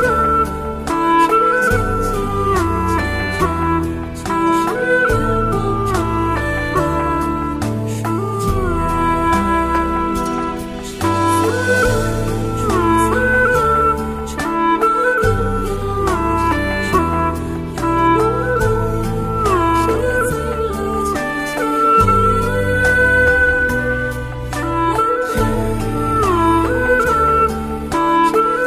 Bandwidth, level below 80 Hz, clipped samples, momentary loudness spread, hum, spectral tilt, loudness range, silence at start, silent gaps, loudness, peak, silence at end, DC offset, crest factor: 15.5 kHz; -28 dBFS; under 0.1%; 7 LU; none; -6 dB/octave; 3 LU; 0 s; none; -16 LUFS; -2 dBFS; 0 s; under 0.1%; 14 dB